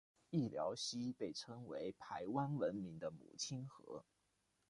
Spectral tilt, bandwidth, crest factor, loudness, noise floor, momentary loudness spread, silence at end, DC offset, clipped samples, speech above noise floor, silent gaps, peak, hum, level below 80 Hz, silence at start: -5 dB/octave; 11.5 kHz; 20 dB; -45 LUFS; -83 dBFS; 10 LU; 0.65 s; under 0.1%; under 0.1%; 38 dB; none; -26 dBFS; none; -78 dBFS; 0.3 s